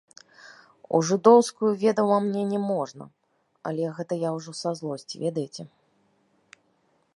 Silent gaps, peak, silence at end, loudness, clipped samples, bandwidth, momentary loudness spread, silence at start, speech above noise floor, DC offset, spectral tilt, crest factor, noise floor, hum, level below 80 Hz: none; -2 dBFS; 1.5 s; -25 LUFS; under 0.1%; 11.5 kHz; 18 LU; 0.45 s; 44 dB; under 0.1%; -6 dB/octave; 24 dB; -68 dBFS; none; -78 dBFS